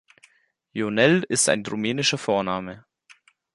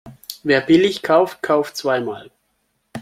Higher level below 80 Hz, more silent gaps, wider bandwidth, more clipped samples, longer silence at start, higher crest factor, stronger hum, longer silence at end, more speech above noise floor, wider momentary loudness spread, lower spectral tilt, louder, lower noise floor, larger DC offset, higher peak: about the same, -62 dBFS vs -60 dBFS; neither; second, 11.5 kHz vs 16 kHz; neither; first, 0.75 s vs 0.05 s; about the same, 20 dB vs 18 dB; neither; first, 0.75 s vs 0 s; second, 37 dB vs 51 dB; second, 12 LU vs 19 LU; second, -3.5 dB/octave vs -5 dB/octave; second, -22 LUFS vs -18 LUFS; second, -59 dBFS vs -68 dBFS; neither; about the same, -4 dBFS vs -2 dBFS